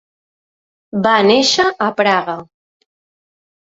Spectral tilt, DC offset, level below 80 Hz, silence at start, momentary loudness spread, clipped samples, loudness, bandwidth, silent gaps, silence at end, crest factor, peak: -3.5 dB/octave; under 0.1%; -60 dBFS; 0.95 s; 14 LU; under 0.1%; -14 LUFS; 8 kHz; none; 1.2 s; 16 dB; -2 dBFS